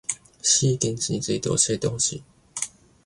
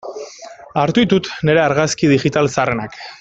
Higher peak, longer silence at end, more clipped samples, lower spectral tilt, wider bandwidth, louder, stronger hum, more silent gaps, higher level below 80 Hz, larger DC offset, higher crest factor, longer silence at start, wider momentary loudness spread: second, -4 dBFS vs 0 dBFS; first, 0.35 s vs 0.05 s; neither; second, -3.5 dB/octave vs -5.5 dB/octave; first, 11.5 kHz vs 8.2 kHz; second, -23 LUFS vs -16 LUFS; neither; neither; about the same, -54 dBFS vs -50 dBFS; neither; about the same, 20 dB vs 16 dB; about the same, 0.1 s vs 0.05 s; second, 13 LU vs 17 LU